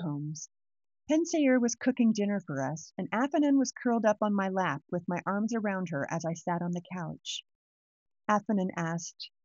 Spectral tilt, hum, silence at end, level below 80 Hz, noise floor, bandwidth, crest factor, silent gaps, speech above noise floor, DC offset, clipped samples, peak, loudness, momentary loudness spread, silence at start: -5.5 dB/octave; none; 0.2 s; -78 dBFS; under -90 dBFS; 7.8 kHz; 18 dB; 7.55-8.06 s; over 60 dB; under 0.1%; under 0.1%; -14 dBFS; -30 LUFS; 12 LU; 0 s